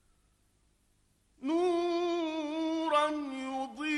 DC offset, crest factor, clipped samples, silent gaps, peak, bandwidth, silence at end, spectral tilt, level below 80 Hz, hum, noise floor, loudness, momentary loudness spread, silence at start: under 0.1%; 18 dB; under 0.1%; none; -16 dBFS; 11 kHz; 0 s; -3 dB/octave; -72 dBFS; none; -71 dBFS; -32 LUFS; 8 LU; 1.4 s